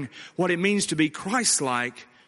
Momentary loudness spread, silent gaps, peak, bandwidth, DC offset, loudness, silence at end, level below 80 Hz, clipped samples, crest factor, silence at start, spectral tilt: 7 LU; none; -8 dBFS; 11.5 kHz; under 0.1%; -24 LUFS; 0.25 s; -68 dBFS; under 0.1%; 18 dB; 0 s; -3 dB/octave